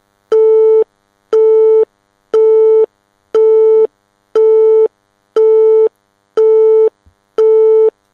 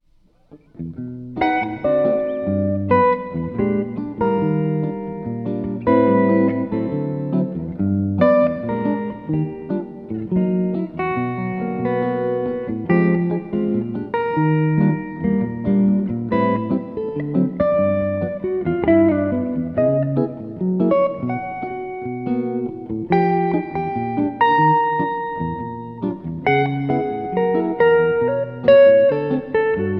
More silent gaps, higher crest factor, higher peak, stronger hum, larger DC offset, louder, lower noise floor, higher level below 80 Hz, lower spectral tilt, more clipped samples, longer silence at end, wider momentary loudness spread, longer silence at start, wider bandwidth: neither; second, 8 dB vs 18 dB; about the same, -2 dBFS vs -2 dBFS; neither; neither; first, -11 LUFS vs -20 LUFS; second, -49 dBFS vs -55 dBFS; second, -68 dBFS vs -50 dBFS; second, -5 dB/octave vs -11 dB/octave; neither; first, 0.25 s vs 0 s; about the same, 9 LU vs 11 LU; second, 0.3 s vs 0.5 s; second, 3.3 kHz vs 5.6 kHz